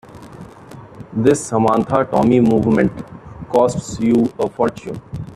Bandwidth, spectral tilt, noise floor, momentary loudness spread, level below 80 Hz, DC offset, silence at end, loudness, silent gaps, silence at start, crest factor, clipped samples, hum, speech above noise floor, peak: 12.5 kHz; -7 dB/octave; -38 dBFS; 21 LU; -46 dBFS; under 0.1%; 0 s; -16 LUFS; none; 0.1 s; 16 dB; under 0.1%; none; 22 dB; 0 dBFS